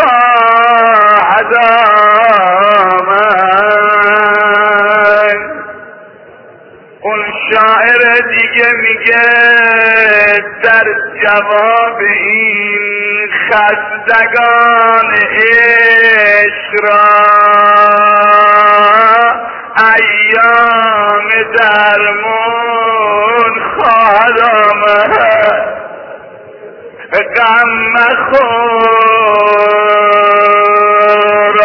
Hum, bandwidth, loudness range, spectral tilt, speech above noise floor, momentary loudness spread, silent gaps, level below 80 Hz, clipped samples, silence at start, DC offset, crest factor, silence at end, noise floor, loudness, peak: none; 5.4 kHz; 5 LU; -5 dB/octave; 29 dB; 7 LU; none; -50 dBFS; 0.9%; 0 s; under 0.1%; 8 dB; 0 s; -36 dBFS; -7 LUFS; 0 dBFS